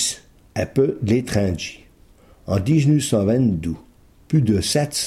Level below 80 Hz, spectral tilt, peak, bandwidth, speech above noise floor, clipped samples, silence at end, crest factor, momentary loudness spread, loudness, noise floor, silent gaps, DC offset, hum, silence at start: -44 dBFS; -5.5 dB/octave; -6 dBFS; 15 kHz; 31 dB; under 0.1%; 0 s; 14 dB; 13 LU; -20 LUFS; -50 dBFS; none; under 0.1%; none; 0 s